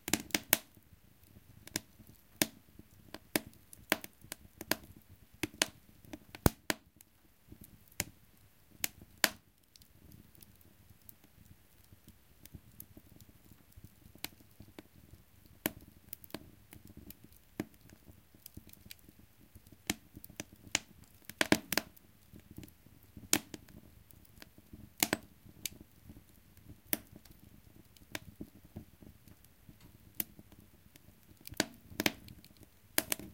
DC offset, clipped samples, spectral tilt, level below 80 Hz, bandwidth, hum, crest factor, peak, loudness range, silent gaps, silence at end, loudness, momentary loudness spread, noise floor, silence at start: under 0.1%; under 0.1%; -2.5 dB/octave; -60 dBFS; 17 kHz; none; 38 dB; -4 dBFS; 16 LU; none; 0 s; -37 LUFS; 27 LU; -65 dBFS; 0.05 s